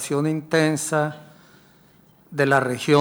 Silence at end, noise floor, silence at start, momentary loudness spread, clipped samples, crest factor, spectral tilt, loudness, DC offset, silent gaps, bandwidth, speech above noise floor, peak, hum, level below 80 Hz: 0 s; -54 dBFS; 0 s; 10 LU; under 0.1%; 18 dB; -5 dB/octave; -22 LUFS; under 0.1%; none; over 20 kHz; 34 dB; -6 dBFS; none; -68 dBFS